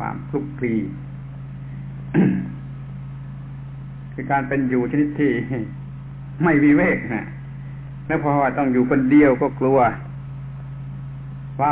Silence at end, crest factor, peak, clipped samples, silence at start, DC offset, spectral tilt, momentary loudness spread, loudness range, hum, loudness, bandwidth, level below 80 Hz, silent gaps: 0 s; 16 dB; -4 dBFS; under 0.1%; 0 s; under 0.1%; -12 dB/octave; 19 LU; 7 LU; none; -20 LUFS; 4 kHz; -46 dBFS; none